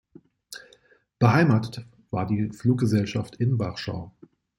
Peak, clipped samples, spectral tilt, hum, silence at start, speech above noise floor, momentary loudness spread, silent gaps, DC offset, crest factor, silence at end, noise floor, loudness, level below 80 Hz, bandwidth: -4 dBFS; under 0.1%; -7.5 dB/octave; none; 0.5 s; 36 dB; 22 LU; none; under 0.1%; 22 dB; 0.5 s; -60 dBFS; -24 LUFS; -58 dBFS; 12 kHz